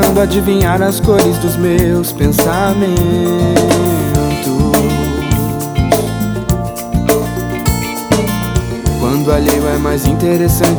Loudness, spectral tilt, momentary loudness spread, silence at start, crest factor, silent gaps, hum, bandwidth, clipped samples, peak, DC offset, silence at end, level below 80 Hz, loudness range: -13 LUFS; -5.5 dB/octave; 6 LU; 0 s; 12 dB; none; none; over 20 kHz; under 0.1%; 0 dBFS; under 0.1%; 0 s; -24 dBFS; 3 LU